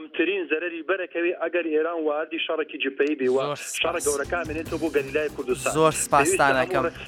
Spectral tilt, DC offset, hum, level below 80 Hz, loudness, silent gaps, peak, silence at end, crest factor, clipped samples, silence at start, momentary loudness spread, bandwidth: -3.5 dB/octave; under 0.1%; none; -50 dBFS; -24 LUFS; none; -4 dBFS; 0 s; 20 dB; under 0.1%; 0 s; 8 LU; 17.5 kHz